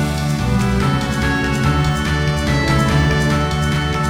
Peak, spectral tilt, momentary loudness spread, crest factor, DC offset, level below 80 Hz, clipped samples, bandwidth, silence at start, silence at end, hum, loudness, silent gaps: -4 dBFS; -5.5 dB/octave; 3 LU; 14 dB; under 0.1%; -26 dBFS; under 0.1%; over 20 kHz; 0 s; 0 s; none; -17 LUFS; none